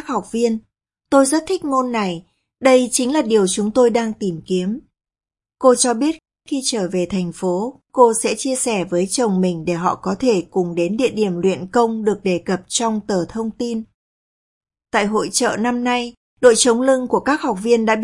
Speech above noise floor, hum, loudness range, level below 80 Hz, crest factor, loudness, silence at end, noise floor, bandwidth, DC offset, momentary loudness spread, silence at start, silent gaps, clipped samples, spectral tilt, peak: over 73 dB; none; 4 LU; -54 dBFS; 18 dB; -18 LUFS; 0 s; under -90 dBFS; 11.5 kHz; under 0.1%; 9 LU; 0 s; 13.94-14.61 s, 16.17-16.37 s; under 0.1%; -4 dB/octave; 0 dBFS